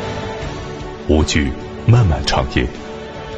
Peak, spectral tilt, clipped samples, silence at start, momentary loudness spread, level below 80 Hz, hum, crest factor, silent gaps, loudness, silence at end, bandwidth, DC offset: 0 dBFS; -5.5 dB/octave; under 0.1%; 0 s; 15 LU; -26 dBFS; none; 18 dB; none; -18 LUFS; 0 s; 8.4 kHz; under 0.1%